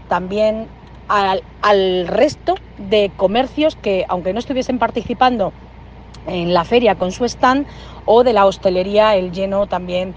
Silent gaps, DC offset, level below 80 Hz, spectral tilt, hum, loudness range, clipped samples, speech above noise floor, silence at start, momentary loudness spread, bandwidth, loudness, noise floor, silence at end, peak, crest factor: none; under 0.1%; -40 dBFS; -5.5 dB/octave; none; 3 LU; under 0.1%; 21 dB; 0 s; 8 LU; 8.8 kHz; -16 LUFS; -37 dBFS; 0 s; 0 dBFS; 16 dB